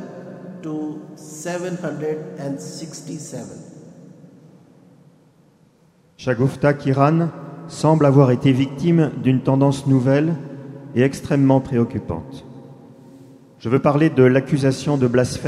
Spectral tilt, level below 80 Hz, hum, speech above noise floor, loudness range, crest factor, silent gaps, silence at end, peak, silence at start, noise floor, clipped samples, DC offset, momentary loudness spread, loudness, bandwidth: -7.5 dB/octave; -52 dBFS; none; 37 dB; 16 LU; 18 dB; none; 0 s; -2 dBFS; 0 s; -56 dBFS; under 0.1%; under 0.1%; 20 LU; -19 LUFS; 12 kHz